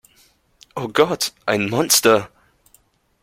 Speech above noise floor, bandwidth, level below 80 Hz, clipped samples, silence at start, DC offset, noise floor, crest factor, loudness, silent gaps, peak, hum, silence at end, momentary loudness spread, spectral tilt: 40 dB; 16.5 kHz; -58 dBFS; under 0.1%; 0.75 s; under 0.1%; -58 dBFS; 22 dB; -17 LUFS; none; 0 dBFS; none; 0.95 s; 17 LU; -2.5 dB/octave